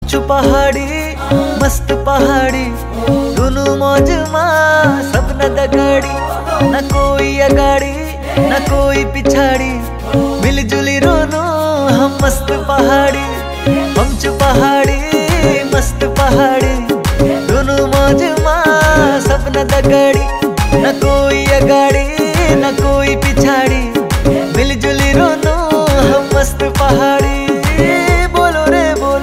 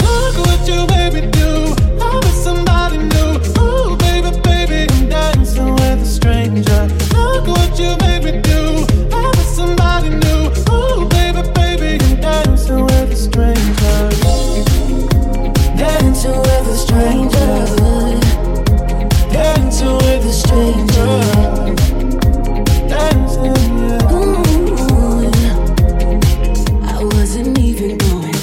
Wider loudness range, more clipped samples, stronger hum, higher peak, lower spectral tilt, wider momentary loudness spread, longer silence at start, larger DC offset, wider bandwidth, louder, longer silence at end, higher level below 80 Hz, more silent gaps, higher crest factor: about the same, 2 LU vs 1 LU; neither; neither; about the same, 0 dBFS vs 0 dBFS; about the same, -5.5 dB/octave vs -6 dB/octave; first, 5 LU vs 2 LU; about the same, 0 s vs 0 s; neither; about the same, 16.5 kHz vs 16.5 kHz; about the same, -12 LUFS vs -13 LUFS; about the same, 0 s vs 0 s; second, -20 dBFS vs -14 dBFS; neither; about the same, 12 dB vs 10 dB